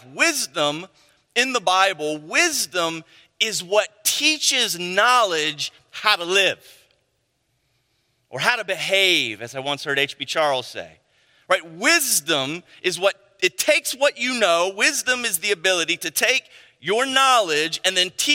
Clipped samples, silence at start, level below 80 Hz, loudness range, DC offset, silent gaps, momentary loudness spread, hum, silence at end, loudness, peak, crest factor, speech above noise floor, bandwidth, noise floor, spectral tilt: under 0.1%; 0.05 s; -74 dBFS; 3 LU; under 0.1%; none; 10 LU; none; 0 s; -20 LUFS; 0 dBFS; 22 dB; 49 dB; 16.5 kHz; -70 dBFS; -1 dB/octave